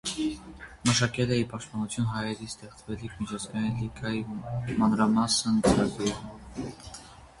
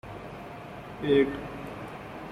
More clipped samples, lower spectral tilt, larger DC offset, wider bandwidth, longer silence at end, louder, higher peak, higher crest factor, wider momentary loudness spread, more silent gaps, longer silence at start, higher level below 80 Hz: neither; second, -4.5 dB/octave vs -7 dB/octave; neither; second, 11.5 kHz vs 13.5 kHz; about the same, 0.1 s vs 0 s; about the same, -28 LUFS vs -29 LUFS; about the same, -8 dBFS vs -10 dBFS; about the same, 22 dB vs 20 dB; about the same, 17 LU vs 17 LU; neither; about the same, 0.05 s vs 0.05 s; about the same, -50 dBFS vs -54 dBFS